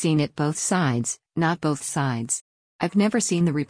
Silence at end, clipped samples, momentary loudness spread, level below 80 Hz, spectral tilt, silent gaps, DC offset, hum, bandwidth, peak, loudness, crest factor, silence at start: 0.05 s; under 0.1%; 6 LU; -60 dBFS; -5 dB/octave; 2.41-2.79 s; under 0.1%; none; 10.5 kHz; -10 dBFS; -24 LUFS; 14 dB; 0 s